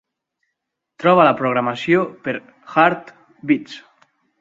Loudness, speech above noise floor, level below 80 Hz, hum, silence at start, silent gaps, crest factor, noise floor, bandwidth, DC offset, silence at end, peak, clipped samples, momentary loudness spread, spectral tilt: -18 LUFS; 61 dB; -64 dBFS; none; 1 s; none; 20 dB; -78 dBFS; 7.8 kHz; under 0.1%; 0.6 s; 0 dBFS; under 0.1%; 17 LU; -7 dB/octave